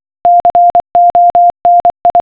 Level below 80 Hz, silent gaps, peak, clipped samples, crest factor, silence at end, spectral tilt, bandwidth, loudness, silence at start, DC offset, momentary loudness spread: -44 dBFS; none; -2 dBFS; under 0.1%; 6 dB; 0 s; -9 dB/octave; 4 kHz; -8 LUFS; 0.25 s; under 0.1%; 2 LU